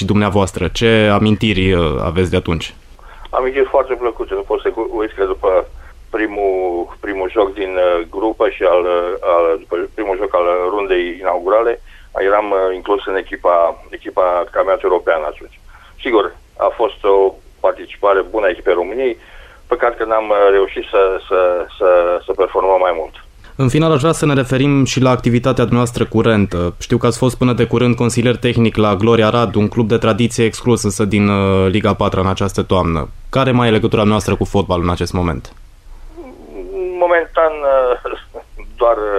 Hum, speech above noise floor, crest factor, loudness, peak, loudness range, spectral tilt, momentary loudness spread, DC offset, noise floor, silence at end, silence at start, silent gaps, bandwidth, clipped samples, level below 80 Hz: none; 21 dB; 14 dB; -15 LUFS; -2 dBFS; 4 LU; -6 dB/octave; 8 LU; under 0.1%; -35 dBFS; 0 s; 0 s; none; 14.5 kHz; under 0.1%; -34 dBFS